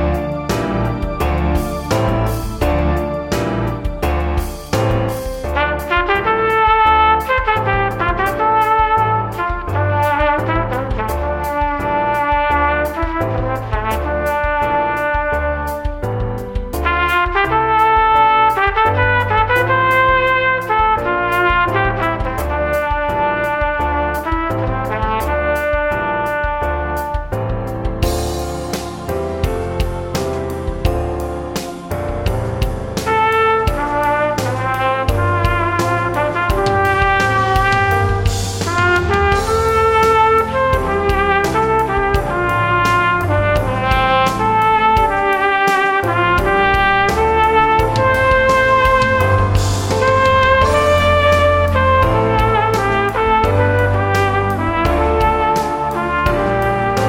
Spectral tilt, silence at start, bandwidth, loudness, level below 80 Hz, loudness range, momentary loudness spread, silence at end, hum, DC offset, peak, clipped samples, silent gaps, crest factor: -5.5 dB/octave; 0 s; 17.5 kHz; -15 LUFS; -26 dBFS; 6 LU; 9 LU; 0 s; none; under 0.1%; 0 dBFS; under 0.1%; none; 14 dB